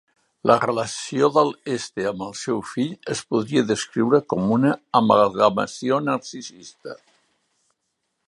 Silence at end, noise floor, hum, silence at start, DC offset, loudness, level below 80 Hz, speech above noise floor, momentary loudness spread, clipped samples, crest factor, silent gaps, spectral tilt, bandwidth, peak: 1.35 s; -76 dBFS; none; 0.45 s; under 0.1%; -21 LUFS; -62 dBFS; 54 dB; 13 LU; under 0.1%; 20 dB; none; -5.5 dB/octave; 11.5 kHz; -2 dBFS